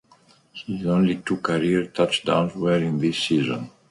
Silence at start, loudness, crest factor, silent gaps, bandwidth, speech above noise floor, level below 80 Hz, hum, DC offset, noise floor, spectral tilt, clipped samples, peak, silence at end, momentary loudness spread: 0.55 s; -23 LUFS; 18 dB; none; 11.5 kHz; 34 dB; -56 dBFS; none; under 0.1%; -56 dBFS; -6 dB/octave; under 0.1%; -4 dBFS; 0.2 s; 10 LU